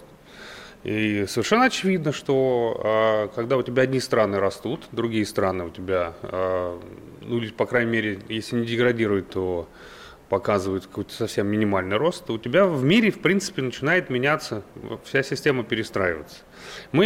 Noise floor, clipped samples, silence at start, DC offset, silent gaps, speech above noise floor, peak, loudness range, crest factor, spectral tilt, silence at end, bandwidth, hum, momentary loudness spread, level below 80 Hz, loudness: -45 dBFS; under 0.1%; 0 s; under 0.1%; none; 21 dB; -8 dBFS; 4 LU; 16 dB; -5.5 dB/octave; 0 s; 16.5 kHz; none; 15 LU; -56 dBFS; -23 LUFS